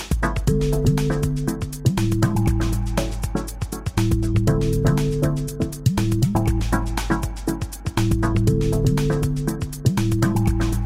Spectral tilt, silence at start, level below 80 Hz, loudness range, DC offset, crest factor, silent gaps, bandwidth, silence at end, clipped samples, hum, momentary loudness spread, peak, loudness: -6.5 dB/octave; 0 s; -28 dBFS; 2 LU; under 0.1%; 16 dB; none; 16 kHz; 0 s; under 0.1%; none; 7 LU; -4 dBFS; -22 LUFS